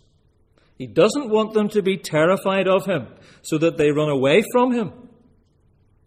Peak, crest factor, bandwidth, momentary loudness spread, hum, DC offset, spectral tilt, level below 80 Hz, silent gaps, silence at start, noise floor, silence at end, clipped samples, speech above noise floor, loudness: -2 dBFS; 18 dB; 15.5 kHz; 10 LU; none; under 0.1%; -5.5 dB/octave; -58 dBFS; none; 0.8 s; -59 dBFS; 1.1 s; under 0.1%; 40 dB; -20 LUFS